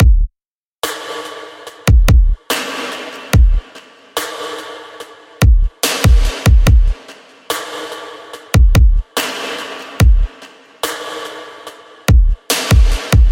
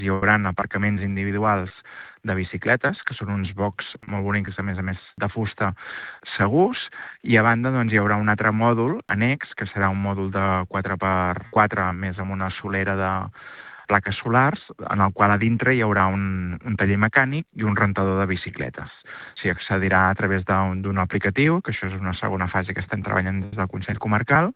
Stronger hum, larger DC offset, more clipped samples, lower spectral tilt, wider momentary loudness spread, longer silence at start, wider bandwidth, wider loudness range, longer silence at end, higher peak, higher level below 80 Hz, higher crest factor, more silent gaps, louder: neither; neither; neither; second, -5 dB/octave vs -10.5 dB/octave; first, 19 LU vs 12 LU; about the same, 0 s vs 0 s; first, 17 kHz vs 4.8 kHz; about the same, 3 LU vs 5 LU; about the same, 0 s vs 0.05 s; about the same, 0 dBFS vs -2 dBFS; first, -14 dBFS vs -54 dBFS; second, 14 dB vs 20 dB; first, 0.46-0.79 s vs none; first, -15 LUFS vs -22 LUFS